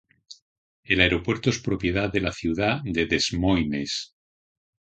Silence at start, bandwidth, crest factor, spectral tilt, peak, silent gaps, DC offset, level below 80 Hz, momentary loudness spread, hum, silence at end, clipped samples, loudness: 0.3 s; 9 kHz; 24 dB; -4.5 dB/octave; -2 dBFS; 0.42-0.83 s; under 0.1%; -42 dBFS; 7 LU; none; 0.8 s; under 0.1%; -24 LUFS